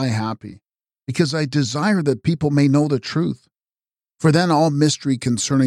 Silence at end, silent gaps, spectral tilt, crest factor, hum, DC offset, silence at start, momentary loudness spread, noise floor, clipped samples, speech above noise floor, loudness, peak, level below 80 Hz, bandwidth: 0 s; none; -5.5 dB/octave; 16 dB; none; under 0.1%; 0 s; 12 LU; under -90 dBFS; under 0.1%; over 72 dB; -19 LUFS; -4 dBFS; -56 dBFS; 12.5 kHz